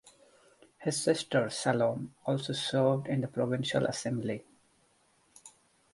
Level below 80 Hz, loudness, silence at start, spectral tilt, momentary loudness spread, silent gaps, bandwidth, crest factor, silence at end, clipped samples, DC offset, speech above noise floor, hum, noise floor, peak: -70 dBFS; -31 LUFS; 0.05 s; -5 dB/octave; 7 LU; none; 11.5 kHz; 20 dB; 0.45 s; under 0.1%; under 0.1%; 38 dB; none; -69 dBFS; -12 dBFS